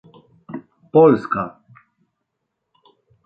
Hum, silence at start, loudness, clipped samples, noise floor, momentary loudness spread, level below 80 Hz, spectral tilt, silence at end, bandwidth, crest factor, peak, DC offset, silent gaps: none; 0.5 s; -16 LUFS; under 0.1%; -77 dBFS; 23 LU; -60 dBFS; -10 dB/octave; 1.75 s; 5 kHz; 20 dB; -2 dBFS; under 0.1%; none